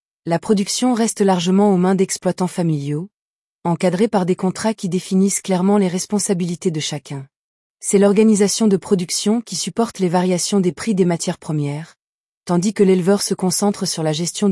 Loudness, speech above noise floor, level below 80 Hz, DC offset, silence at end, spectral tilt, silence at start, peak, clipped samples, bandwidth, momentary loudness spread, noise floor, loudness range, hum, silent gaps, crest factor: -18 LUFS; over 73 dB; -62 dBFS; under 0.1%; 0 s; -5 dB/octave; 0.25 s; -4 dBFS; under 0.1%; 12 kHz; 9 LU; under -90 dBFS; 3 LU; none; 3.14-3.59 s, 7.36-7.75 s, 11.99-12.41 s; 14 dB